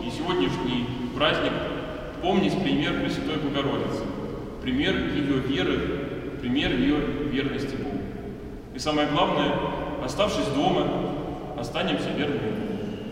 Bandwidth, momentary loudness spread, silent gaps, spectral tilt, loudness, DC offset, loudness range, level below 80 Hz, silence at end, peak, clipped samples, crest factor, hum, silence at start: 15 kHz; 9 LU; none; -6 dB/octave; -26 LUFS; under 0.1%; 1 LU; -42 dBFS; 0 s; -8 dBFS; under 0.1%; 18 dB; none; 0 s